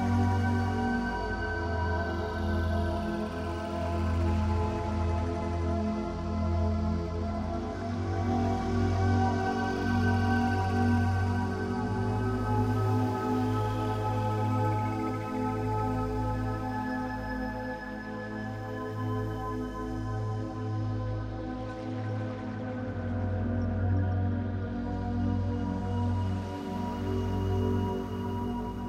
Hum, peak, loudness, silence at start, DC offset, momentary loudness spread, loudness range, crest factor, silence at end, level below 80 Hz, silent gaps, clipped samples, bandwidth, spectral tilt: none; -16 dBFS; -31 LUFS; 0 s; under 0.1%; 8 LU; 6 LU; 14 dB; 0 s; -42 dBFS; none; under 0.1%; 9.8 kHz; -8 dB/octave